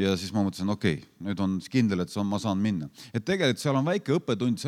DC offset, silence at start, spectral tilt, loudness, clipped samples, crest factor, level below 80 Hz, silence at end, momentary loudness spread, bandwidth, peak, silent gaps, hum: under 0.1%; 0 s; -6 dB/octave; -28 LUFS; under 0.1%; 18 dB; -66 dBFS; 0 s; 7 LU; 15 kHz; -10 dBFS; none; none